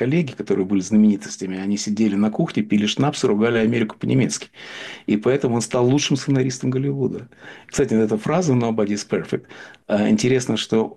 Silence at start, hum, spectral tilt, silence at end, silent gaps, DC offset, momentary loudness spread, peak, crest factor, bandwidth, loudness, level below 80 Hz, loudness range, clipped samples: 0 s; none; -5.5 dB/octave; 0.05 s; none; under 0.1%; 11 LU; -8 dBFS; 12 dB; 11.5 kHz; -20 LUFS; -54 dBFS; 2 LU; under 0.1%